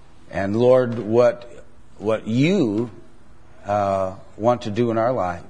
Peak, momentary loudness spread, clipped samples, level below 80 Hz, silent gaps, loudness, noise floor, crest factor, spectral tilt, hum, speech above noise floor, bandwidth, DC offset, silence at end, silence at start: -4 dBFS; 12 LU; under 0.1%; -54 dBFS; none; -21 LUFS; -50 dBFS; 18 dB; -7.5 dB/octave; none; 30 dB; 10 kHz; 1%; 0.05 s; 0.3 s